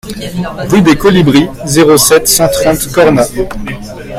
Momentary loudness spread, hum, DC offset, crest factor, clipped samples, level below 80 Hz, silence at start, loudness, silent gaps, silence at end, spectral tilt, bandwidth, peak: 13 LU; none; under 0.1%; 10 dB; 0.7%; -30 dBFS; 0.05 s; -8 LUFS; none; 0 s; -4.5 dB/octave; over 20 kHz; 0 dBFS